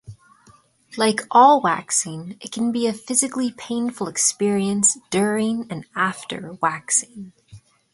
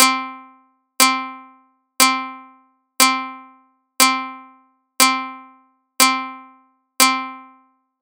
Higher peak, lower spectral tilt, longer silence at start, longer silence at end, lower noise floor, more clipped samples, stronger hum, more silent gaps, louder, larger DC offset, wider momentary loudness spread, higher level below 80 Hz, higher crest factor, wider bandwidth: about the same, -2 dBFS vs 0 dBFS; first, -3 dB/octave vs 1.5 dB/octave; about the same, 0.1 s vs 0 s; second, 0.35 s vs 0.6 s; about the same, -54 dBFS vs -56 dBFS; neither; neither; neither; second, -20 LUFS vs -16 LUFS; neither; about the same, 16 LU vs 18 LU; first, -64 dBFS vs -72 dBFS; about the same, 20 dB vs 22 dB; second, 12 kHz vs over 20 kHz